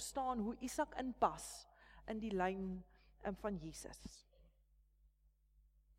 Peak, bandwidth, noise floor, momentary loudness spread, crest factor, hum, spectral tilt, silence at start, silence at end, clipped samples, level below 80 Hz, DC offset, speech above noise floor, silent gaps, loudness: -20 dBFS; 16.5 kHz; -74 dBFS; 17 LU; 24 dB; none; -4.5 dB/octave; 0 s; 1.5 s; under 0.1%; -62 dBFS; under 0.1%; 31 dB; none; -43 LUFS